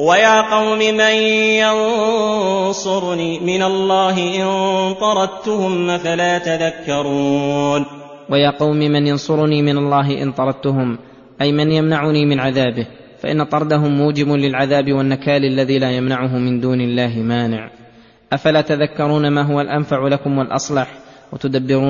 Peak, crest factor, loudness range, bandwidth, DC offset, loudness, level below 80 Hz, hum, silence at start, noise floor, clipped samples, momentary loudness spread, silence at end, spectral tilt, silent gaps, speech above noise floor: 0 dBFS; 16 dB; 3 LU; 7.4 kHz; under 0.1%; -16 LUFS; -54 dBFS; none; 0 s; -45 dBFS; under 0.1%; 7 LU; 0 s; -5.5 dB/octave; none; 29 dB